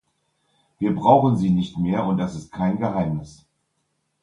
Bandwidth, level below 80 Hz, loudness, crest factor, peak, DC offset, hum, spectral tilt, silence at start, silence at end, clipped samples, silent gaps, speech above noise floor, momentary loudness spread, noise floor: 10 kHz; -50 dBFS; -21 LUFS; 20 dB; -2 dBFS; under 0.1%; none; -8.5 dB/octave; 0.8 s; 0.95 s; under 0.1%; none; 52 dB; 11 LU; -73 dBFS